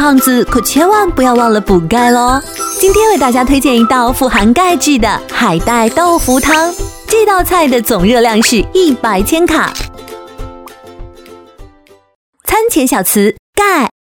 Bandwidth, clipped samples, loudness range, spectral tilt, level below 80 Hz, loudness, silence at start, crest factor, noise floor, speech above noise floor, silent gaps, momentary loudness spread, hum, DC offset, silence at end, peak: over 20 kHz; 0.1%; 7 LU; -4 dB/octave; -28 dBFS; -10 LUFS; 0 s; 10 dB; -43 dBFS; 34 dB; 12.15-12.33 s, 13.39-13.53 s; 7 LU; none; under 0.1%; 0.15 s; 0 dBFS